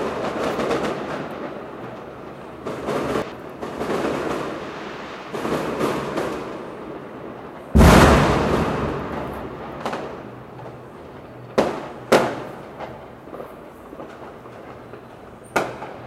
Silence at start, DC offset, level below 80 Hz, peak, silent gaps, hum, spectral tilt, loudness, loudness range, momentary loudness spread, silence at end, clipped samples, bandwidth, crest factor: 0 s; under 0.1%; -32 dBFS; 0 dBFS; none; none; -6 dB/octave; -22 LUFS; 10 LU; 20 LU; 0 s; under 0.1%; 15.5 kHz; 24 dB